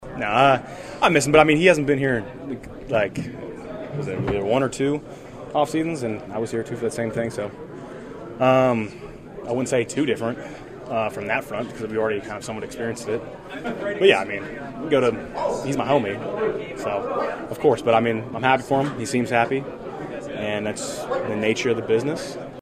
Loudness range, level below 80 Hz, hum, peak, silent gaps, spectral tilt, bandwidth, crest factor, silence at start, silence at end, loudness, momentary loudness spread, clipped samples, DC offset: 6 LU; -50 dBFS; none; 0 dBFS; none; -5 dB/octave; 14.5 kHz; 22 dB; 0 s; 0 s; -23 LUFS; 16 LU; under 0.1%; under 0.1%